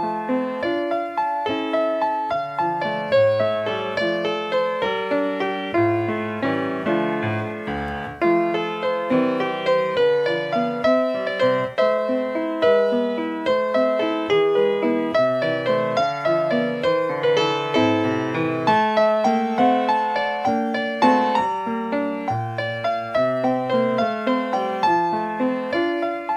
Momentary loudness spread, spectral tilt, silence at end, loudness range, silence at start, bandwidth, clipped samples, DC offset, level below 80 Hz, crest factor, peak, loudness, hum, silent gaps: 6 LU; -6.5 dB/octave; 0 s; 3 LU; 0 s; 10 kHz; under 0.1%; under 0.1%; -56 dBFS; 16 dB; -4 dBFS; -21 LUFS; none; none